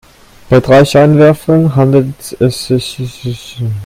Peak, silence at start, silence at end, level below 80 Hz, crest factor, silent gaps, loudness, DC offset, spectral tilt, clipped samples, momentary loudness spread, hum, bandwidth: 0 dBFS; 0.5 s; 0 s; -38 dBFS; 10 dB; none; -10 LUFS; under 0.1%; -7 dB/octave; 0.4%; 14 LU; none; 16 kHz